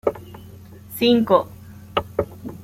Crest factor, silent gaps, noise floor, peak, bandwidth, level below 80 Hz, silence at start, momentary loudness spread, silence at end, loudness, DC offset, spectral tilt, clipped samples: 20 dB; none; -41 dBFS; -2 dBFS; 16 kHz; -50 dBFS; 0.05 s; 24 LU; 0 s; -21 LUFS; under 0.1%; -6 dB/octave; under 0.1%